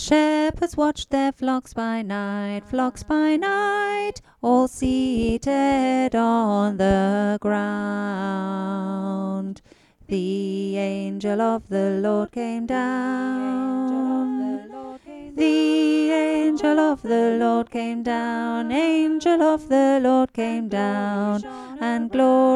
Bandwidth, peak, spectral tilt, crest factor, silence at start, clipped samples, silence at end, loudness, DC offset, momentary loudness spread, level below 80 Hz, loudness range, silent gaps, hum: 11.5 kHz; -6 dBFS; -6 dB/octave; 16 dB; 0 s; under 0.1%; 0 s; -22 LUFS; under 0.1%; 8 LU; -48 dBFS; 5 LU; none; none